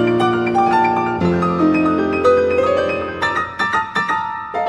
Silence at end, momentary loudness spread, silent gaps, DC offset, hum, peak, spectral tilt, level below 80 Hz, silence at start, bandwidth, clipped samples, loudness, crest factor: 0 s; 5 LU; none; under 0.1%; none; -4 dBFS; -6.5 dB/octave; -46 dBFS; 0 s; 10.5 kHz; under 0.1%; -17 LUFS; 14 dB